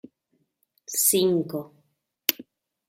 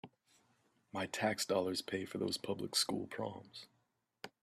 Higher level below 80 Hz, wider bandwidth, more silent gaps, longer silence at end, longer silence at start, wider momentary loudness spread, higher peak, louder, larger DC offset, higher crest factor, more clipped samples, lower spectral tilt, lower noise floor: first, -72 dBFS vs -78 dBFS; about the same, 16.5 kHz vs 15 kHz; neither; first, 0.45 s vs 0.15 s; first, 0.9 s vs 0.05 s; about the same, 19 LU vs 19 LU; first, 0 dBFS vs -20 dBFS; first, -23 LUFS vs -38 LUFS; neither; first, 28 dB vs 20 dB; neither; about the same, -3 dB/octave vs -3 dB/octave; second, -73 dBFS vs -81 dBFS